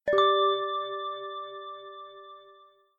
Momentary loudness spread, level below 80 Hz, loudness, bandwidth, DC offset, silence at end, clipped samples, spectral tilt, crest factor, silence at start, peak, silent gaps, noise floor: 23 LU; -70 dBFS; -27 LUFS; 7 kHz; under 0.1%; 0.45 s; under 0.1%; -4 dB/octave; 18 dB; 0.05 s; -12 dBFS; none; -57 dBFS